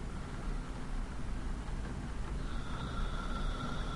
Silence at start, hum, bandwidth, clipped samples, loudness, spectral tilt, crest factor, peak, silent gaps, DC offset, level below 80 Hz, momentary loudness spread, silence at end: 0 s; none; 11.5 kHz; under 0.1%; -42 LUFS; -6 dB/octave; 14 dB; -24 dBFS; none; under 0.1%; -40 dBFS; 4 LU; 0 s